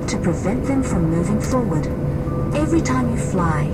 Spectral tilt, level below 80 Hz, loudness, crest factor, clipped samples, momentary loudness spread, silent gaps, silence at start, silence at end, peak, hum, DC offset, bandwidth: -7 dB/octave; -30 dBFS; -20 LUFS; 14 dB; under 0.1%; 4 LU; none; 0 s; 0 s; -6 dBFS; none; under 0.1%; 14.5 kHz